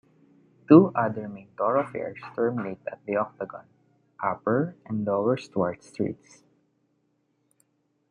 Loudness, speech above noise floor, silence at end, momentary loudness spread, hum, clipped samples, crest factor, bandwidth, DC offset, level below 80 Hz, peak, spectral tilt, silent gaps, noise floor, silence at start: -26 LUFS; 47 dB; 1.95 s; 19 LU; none; under 0.1%; 24 dB; 9.6 kHz; under 0.1%; -70 dBFS; -4 dBFS; -9 dB/octave; none; -72 dBFS; 0.7 s